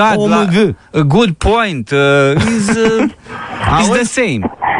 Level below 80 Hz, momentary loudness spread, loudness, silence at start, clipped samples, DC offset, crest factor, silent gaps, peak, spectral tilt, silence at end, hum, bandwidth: -32 dBFS; 6 LU; -12 LUFS; 0 s; under 0.1%; under 0.1%; 12 dB; none; 0 dBFS; -5.5 dB/octave; 0 s; none; 11 kHz